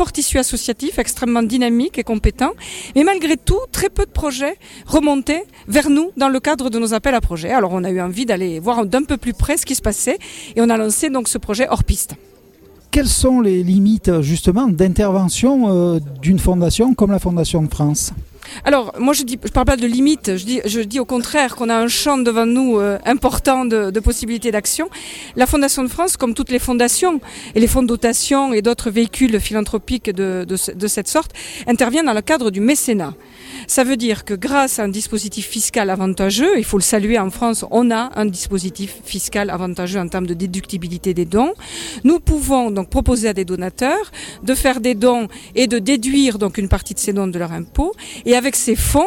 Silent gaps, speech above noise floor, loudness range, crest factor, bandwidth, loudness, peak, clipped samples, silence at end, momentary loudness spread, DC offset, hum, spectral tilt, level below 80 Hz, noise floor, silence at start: none; 29 dB; 3 LU; 14 dB; 17.5 kHz; -17 LUFS; -2 dBFS; under 0.1%; 0 s; 7 LU; under 0.1%; none; -4.5 dB/octave; -30 dBFS; -46 dBFS; 0 s